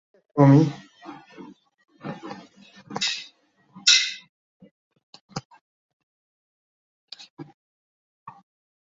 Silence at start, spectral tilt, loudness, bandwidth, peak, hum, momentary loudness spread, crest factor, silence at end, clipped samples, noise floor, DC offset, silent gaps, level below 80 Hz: 0.35 s; -4 dB/octave; -20 LUFS; 7.6 kHz; -2 dBFS; none; 27 LU; 24 dB; 0.5 s; under 0.1%; -58 dBFS; under 0.1%; 4.29-4.60 s, 4.71-4.91 s, 5.03-5.13 s, 5.21-5.29 s, 5.45-5.50 s, 5.61-7.08 s, 7.30-7.37 s, 7.54-8.26 s; -68 dBFS